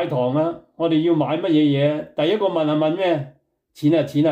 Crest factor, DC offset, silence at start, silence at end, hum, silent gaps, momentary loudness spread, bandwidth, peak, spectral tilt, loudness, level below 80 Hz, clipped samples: 12 dB; under 0.1%; 0 s; 0 s; none; none; 6 LU; 8.4 kHz; -8 dBFS; -8 dB/octave; -20 LUFS; -66 dBFS; under 0.1%